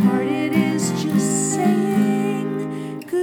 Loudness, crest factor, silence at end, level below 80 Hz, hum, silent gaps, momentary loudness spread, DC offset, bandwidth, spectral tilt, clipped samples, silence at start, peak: -20 LUFS; 16 dB; 0 s; -68 dBFS; none; none; 7 LU; under 0.1%; 18.5 kHz; -5.5 dB/octave; under 0.1%; 0 s; -4 dBFS